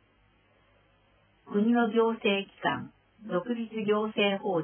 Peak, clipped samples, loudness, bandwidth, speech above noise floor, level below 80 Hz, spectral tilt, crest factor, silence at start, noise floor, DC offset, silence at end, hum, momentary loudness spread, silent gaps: -12 dBFS; under 0.1%; -28 LUFS; 3.5 kHz; 38 dB; -72 dBFS; -9.5 dB/octave; 18 dB; 1.5 s; -65 dBFS; under 0.1%; 0 s; none; 9 LU; none